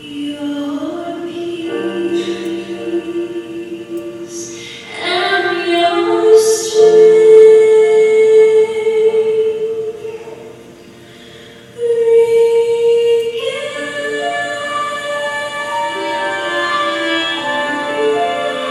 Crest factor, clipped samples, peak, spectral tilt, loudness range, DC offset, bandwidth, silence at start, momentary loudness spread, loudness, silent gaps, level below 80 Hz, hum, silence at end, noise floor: 14 dB; under 0.1%; 0 dBFS; -3 dB/octave; 12 LU; under 0.1%; 12.5 kHz; 0 s; 17 LU; -14 LUFS; none; -60 dBFS; none; 0 s; -38 dBFS